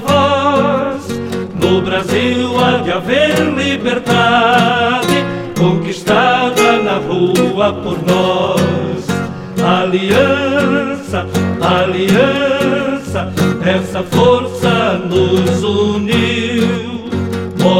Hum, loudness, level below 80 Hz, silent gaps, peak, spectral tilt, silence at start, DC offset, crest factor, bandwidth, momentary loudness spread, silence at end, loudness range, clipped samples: none; -13 LUFS; -44 dBFS; none; 0 dBFS; -5.5 dB/octave; 0 s; under 0.1%; 12 dB; 16.5 kHz; 8 LU; 0 s; 2 LU; under 0.1%